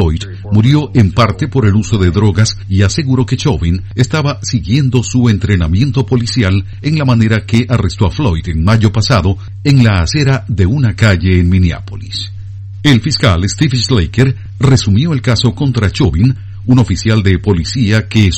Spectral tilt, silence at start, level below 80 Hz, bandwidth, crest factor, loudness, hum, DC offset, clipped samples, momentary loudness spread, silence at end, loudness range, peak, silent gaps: -6 dB/octave; 0 s; -26 dBFS; 8.8 kHz; 10 dB; -12 LUFS; none; under 0.1%; 0.9%; 5 LU; 0 s; 1 LU; 0 dBFS; none